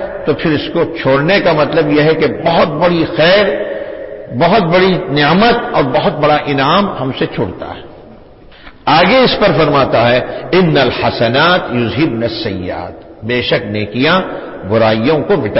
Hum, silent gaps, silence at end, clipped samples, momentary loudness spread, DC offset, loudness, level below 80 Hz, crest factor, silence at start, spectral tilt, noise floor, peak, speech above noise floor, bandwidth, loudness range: none; none; 0 s; under 0.1%; 12 LU; under 0.1%; -12 LUFS; -38 dBFS; 12 dB; 0 s; -9.5 dB/octave; -37 dBFS; 0 dBFS; 26 dB; 5.8 kHz; 4 LU